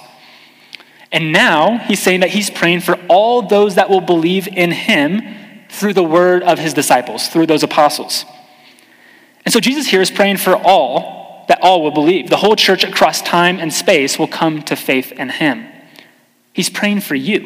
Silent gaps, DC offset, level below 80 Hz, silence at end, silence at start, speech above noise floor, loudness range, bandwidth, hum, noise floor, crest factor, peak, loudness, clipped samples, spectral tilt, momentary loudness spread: none; under 0.1%; -62 dBFS; 0 s; 1.1 s; 38 dB; 3 LU; 16 kHz; none; -51 dBFS; 14 dB; 0 dBFS; -13 LUFS; under 0.1%; -4 dB/octave; 9 LU